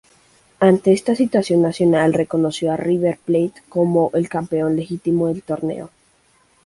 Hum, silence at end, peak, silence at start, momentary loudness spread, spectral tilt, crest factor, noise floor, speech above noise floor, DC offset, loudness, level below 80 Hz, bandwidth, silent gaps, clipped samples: none; 0.8 s; -2 dBFS; 0.6 s; 7 LU; -7 dB/octave; 16 dB; -58 dBFS; 40 dB; under 0.1%; -18 LUFS; -56 dBFS; 11.5 kHz; none; under 0.1%